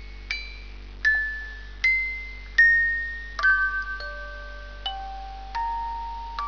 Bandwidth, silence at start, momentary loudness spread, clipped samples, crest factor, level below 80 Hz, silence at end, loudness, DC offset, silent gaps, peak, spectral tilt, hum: 5.4 kHz; 0 s; 20 LU; under 0.1%; 18 dB; -40 dBFS; 0 s; -24 LUFS; 0.3%; none; -8 dBFS; -2.5 dB/octave; none